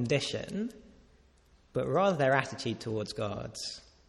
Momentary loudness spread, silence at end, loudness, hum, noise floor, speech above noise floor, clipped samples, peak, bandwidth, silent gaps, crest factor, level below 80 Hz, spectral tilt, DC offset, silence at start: 12 LU; 0.3 s; -32 LUFS; none; -63 dBFS; 32 dB; under 0.1%; -10 dBFS; 13.5 kHz; none; 22 dB; -60 dBFS; -5 dB/octave; under 0.1%; 0 s